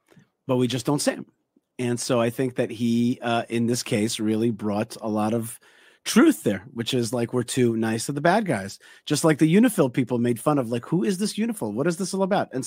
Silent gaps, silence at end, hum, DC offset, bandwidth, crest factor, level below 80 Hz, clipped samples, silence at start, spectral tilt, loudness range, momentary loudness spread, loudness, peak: none; 0 s; none; under 0.1%; 16 kHz; 20 dB; -66 dBFS; under 0.1%; 0.5 s; -5.5 dB/octave; 3 LU; 9 LU; -24 LUFS; -4 dBFS